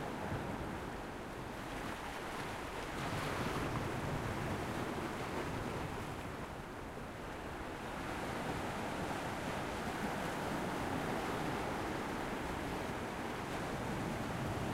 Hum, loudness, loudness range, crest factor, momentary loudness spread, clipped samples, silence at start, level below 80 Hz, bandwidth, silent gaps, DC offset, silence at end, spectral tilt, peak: none; -41 LUFS; 3 LU; 14 dB; 6 LU; under 0.1%; 0 s; -54 dBFS; 16 kHz; none; under 0.1%; 0 s; -5 dB/octave; -26 dBFS